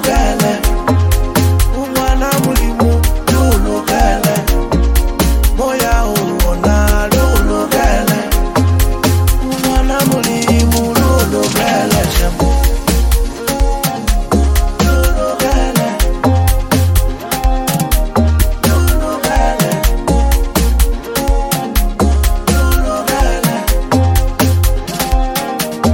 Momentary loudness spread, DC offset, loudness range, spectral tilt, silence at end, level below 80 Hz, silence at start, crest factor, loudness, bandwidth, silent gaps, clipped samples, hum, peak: 4 LU; under 0.1%; 2 LU; -5 dB/octave; 0 s; -14 dBFS; 0 s; 12 dB; -14 LUFS; 17 kHz; none; under 0.1%; none; 0 dBFS